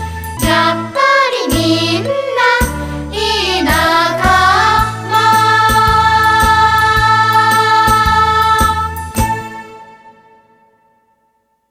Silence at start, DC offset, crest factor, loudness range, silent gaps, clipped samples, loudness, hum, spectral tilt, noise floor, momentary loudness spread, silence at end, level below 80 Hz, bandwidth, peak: 0 s; under 0.1%; 12 dB; 5 LU; none; under 0.1%; -11 LUFS; none; -3.5 dB/octave; -60 dBFS; 9 LU; 1.6 s; -28 dBFS; 16.5 kHz; 0 dBFS